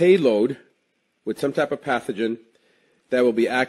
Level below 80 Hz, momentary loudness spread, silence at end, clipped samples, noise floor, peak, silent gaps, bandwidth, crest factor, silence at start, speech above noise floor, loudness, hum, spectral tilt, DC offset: -68 dBFS; 16 LU; 0 s; under 0.1%; -70 dBFS; -4 dBFS; none; 12.5 kHz; 18 dB; 0 s; 50 dB; -22 LUFS; none; -6 dB/octave; under 0.1%